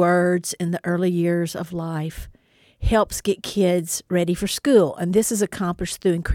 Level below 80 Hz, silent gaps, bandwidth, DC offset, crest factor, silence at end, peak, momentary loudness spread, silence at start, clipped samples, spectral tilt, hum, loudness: -38 dBFS; none; 17 kHz; under 0.1%; 18 dB; 0 s; -4 dBFS; 10 LU; 0 s; under 0.1%; -5 dB/octave; none; -22 LUFS